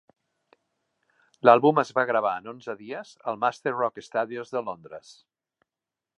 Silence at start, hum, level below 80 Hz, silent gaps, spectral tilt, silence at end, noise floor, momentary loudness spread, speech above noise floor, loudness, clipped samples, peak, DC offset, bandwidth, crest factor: 1.45 s; none; -78 dBFS; none; -6 dB/octave; 1.2 s; -89 dBFS; 19 LU; 64 dB; -25 LUFS; under 0.1%; -2 dBFS; under 0.1%; 10.5 kHz; 26 dB